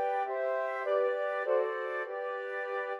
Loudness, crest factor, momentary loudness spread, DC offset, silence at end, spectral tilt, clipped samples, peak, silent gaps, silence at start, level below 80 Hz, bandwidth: -33 LUFS; 14 dB; 6 LU; under 0.1%; 0 s; -2 dB/octave; under 0.1%; -18 dBFS; none; 0 s; under -90 dBFS; 6.8 kHz